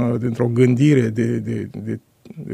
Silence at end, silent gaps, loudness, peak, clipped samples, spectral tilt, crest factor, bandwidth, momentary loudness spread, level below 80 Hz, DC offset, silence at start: 0 s; none; -19 LUFS; -2 dBFS; under 0.1%; -8 dB/octave; 16 dB; 10.5 kHz; 15 LU; -58 dBFS; under 0.1%; 0 s